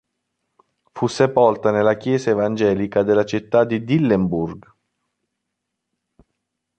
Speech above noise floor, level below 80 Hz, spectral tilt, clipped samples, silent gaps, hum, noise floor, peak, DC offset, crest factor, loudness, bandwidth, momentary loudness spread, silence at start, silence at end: 61 dB; -52 dBFS; -7 dB/octave; under 0.1%; none; none; -79 dBFS; -2 dBFS; under 0.1%; 18 dB; -19 LUFS; 8.8 kHz; 7 LU; 0.95 s; 2.2 s